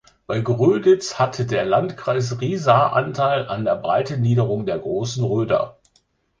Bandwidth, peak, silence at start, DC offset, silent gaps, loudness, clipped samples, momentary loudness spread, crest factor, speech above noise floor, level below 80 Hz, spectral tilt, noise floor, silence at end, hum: 9.2 kHz; 0 dBFS; 0.3 s; under 0.1%; none; -20 LUFS; under 0.1%; 8 LU; 20 dB; 44 dB; -54 dBFS; -6.5 dB/octave; -64 dBFS; 0.7 s; none